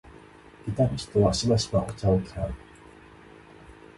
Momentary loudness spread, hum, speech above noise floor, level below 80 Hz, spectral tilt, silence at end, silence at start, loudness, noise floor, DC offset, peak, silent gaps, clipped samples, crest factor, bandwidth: 12 LU; none; 25 dB; -44 dBFS; -6 dB/octave; 0.25 s; 0.65 s; -26 LUFS; -50 dBFS; under 0.1%; -8 dBFS; none; under 0.1%; 20 dB; 11.5 kHz